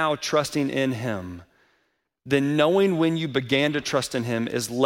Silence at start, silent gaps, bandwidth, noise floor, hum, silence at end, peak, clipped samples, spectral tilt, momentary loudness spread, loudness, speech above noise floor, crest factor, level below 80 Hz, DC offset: 0 s; none; 16.5 kHz; -71 dBFS; none; 0 s; -6 dBFS; under 0.1%; -5 dB/octave; 9 LU; -24 LUFS; 48 dB; 18 dB; -60 dBFS; under 0.1%